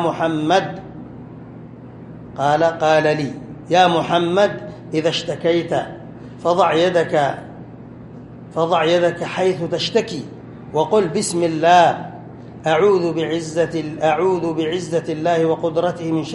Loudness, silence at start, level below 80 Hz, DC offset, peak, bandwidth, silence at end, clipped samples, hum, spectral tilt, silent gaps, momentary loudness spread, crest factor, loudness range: -18 LUFS; 0 s; -54 dBFS; under 0.1%; -2 dBFS; 11.5 kHz; 0 s; under 0.1%; none; -5 dB/octave; none; 22 LU; 18 dB; 3 LU